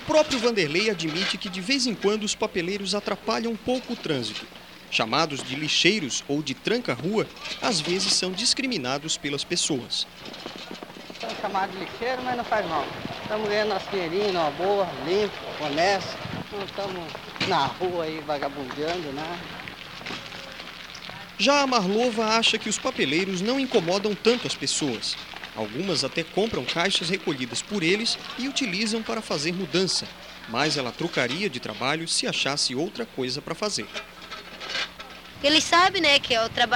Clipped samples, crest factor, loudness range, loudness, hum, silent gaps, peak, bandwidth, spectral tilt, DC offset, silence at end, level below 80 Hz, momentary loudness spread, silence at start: under 0.1%; 22 dB; 6 LU; -25 LUFS; none; none; -4 dBFS; 18.5 kHz; -3 dB/octave; 0.1%; 0 s; -58 dBFS; 14 LU; 0 s